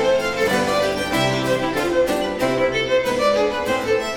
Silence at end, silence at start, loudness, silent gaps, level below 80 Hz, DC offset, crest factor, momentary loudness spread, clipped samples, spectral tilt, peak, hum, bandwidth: 0 s; 0 s; -19 LUFS; none; -44 dBFS; 0.1%; 14 dB; 2 LU; under 0.1%; -4.5 dB/octave; -6 dBFS; none; 18 kHz